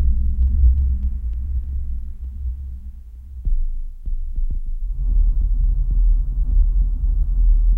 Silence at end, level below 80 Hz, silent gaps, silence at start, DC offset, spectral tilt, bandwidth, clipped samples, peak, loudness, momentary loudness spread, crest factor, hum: 0 s; -18 dBFS; none; 0 s; under 0.1%; -11 dB/octave; 0.6 kHz; under 0.1%; -6 dBFS; -24 LUFS; 13 LU; 12 dB; none